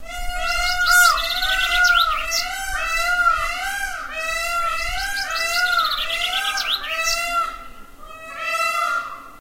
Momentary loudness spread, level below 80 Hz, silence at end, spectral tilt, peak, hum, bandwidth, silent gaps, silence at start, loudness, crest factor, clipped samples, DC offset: 11 LU; -36 dBFS; 0 s; 0.5 dB/octave; -2 dBFS; none; 16 kHz; none; 0 s; -19 LUFS; 18 dB; under 0.1%; under 0.1%